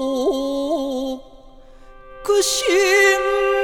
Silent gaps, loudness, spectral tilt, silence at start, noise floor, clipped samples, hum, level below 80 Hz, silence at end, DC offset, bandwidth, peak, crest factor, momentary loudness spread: none; -18 LUFS; -1 dB/octave; 0 s; -43 dBFS; under 0.1%; none; -46 dBFS; 0 s; under 0.1%; 18 kHz; -2 dBFS; 16 dB; 14 LU